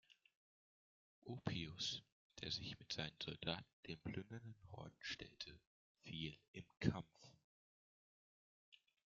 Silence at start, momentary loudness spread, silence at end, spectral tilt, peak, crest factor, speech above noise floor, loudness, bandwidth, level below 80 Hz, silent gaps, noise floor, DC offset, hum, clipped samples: 0.1 s; 17 LU; 0.4 s; -3.5 dB/octave; -22 dBFS; 30 dB; over 41 dB; -49 LUFS; 7.4 kHz; -74 dBFS; 0.37-1.22 s, 2.12-2.30 s, 3.73-3.83 s, 5.67-5.95 s, 6.48-6.54 s, 7.44-8.72 s; under -90 dBFS; under 0.1%; none; under 0.1%